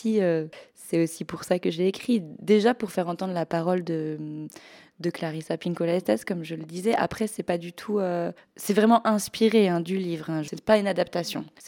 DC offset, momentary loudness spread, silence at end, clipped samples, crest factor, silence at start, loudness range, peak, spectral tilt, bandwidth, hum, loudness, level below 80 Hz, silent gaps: under 0.1%; 12 LU; 0 s; under 0.1%; 20 dB; 0 s; 5 LU; -6 dBFS; -6 dB/octave; 18 kHz; none; -26 LUFS; -66 dBFS; none